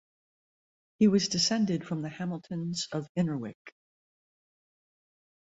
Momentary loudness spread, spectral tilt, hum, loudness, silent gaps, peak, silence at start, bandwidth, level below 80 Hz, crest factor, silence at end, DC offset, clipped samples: 11 LU; -5 dB/octave; none; -29 LUFS; 3.09-3.15 s, 3.55-3.65 s; -12 dBFS; 1 s; 8 kHz; -68 dBFS; 20 dB; 1.9 s; under 0.1%; under 0.1%